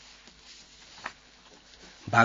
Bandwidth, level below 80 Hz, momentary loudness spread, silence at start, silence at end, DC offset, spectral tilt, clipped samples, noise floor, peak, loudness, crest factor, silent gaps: 7.4 kHz; -64 dBFS; 12 LU; 1.05 s; 0 s; under 0.1%; -3.5 dB/octave; under 0.1%; -55 dBFS; -6 dBFS; -34 LUFS; 26 dB; none